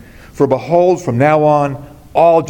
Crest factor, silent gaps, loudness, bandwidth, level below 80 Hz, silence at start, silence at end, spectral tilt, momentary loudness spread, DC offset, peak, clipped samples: 12 dB; none; -13 LUFS; 17 kHz; -46 dBFS; 0.35 s; 0 s; -7.5 dB/octave; 9 LU; under 0.1%; 0 dBFS; under 0.1%